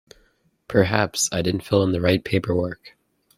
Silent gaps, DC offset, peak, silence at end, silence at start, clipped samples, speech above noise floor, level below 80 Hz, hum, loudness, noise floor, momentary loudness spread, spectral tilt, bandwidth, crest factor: none; under 0.1%; -2 dBFS; 0.5 s; 0.7 s; under 0.1%; 42 dB; -50 dBFS; none; -22 LUFS; -63 dBFS; 6 LU; -4.5 dB/octave; 16 kHz; 22 dB